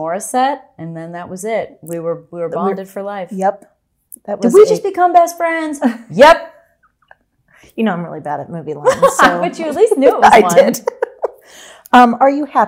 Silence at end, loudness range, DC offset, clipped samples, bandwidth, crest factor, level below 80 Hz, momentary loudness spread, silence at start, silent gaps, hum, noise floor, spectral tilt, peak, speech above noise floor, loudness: 0 s; 10 LU; under 0.1%; 0.5%; 16.5 kHz; 14 dB; -50 dBFS; 17 LU; 0 s; none; none; -56 dBFS; -4.5 dB/octave; 0 dBFS; 43 dB; -13 LUFS